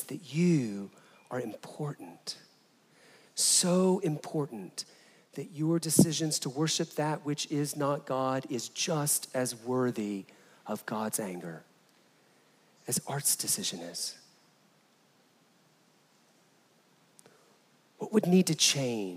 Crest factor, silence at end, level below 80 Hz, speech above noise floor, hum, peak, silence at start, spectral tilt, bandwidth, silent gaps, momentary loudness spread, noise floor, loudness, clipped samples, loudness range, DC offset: 26 dB; 0 s; -78 dBFS; 35 dB; none; -8 dBFS; 0 s; -4 dB/octave; 16 kHz; none; 17 LU; -66 dBFS; -30 LUFS; under 0.1%; 7 LU; under 0.1%